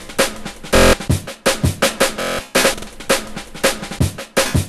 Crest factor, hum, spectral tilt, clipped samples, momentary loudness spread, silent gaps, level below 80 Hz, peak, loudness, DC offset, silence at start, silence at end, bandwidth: 18 dB; none; -3.5 dB/octave; under 0.1%; 8 LU; none; -30 dBFS; 0 dBFS; -17 LUFS; under 0.1%; 0 s; 0 s; 14.5 kHz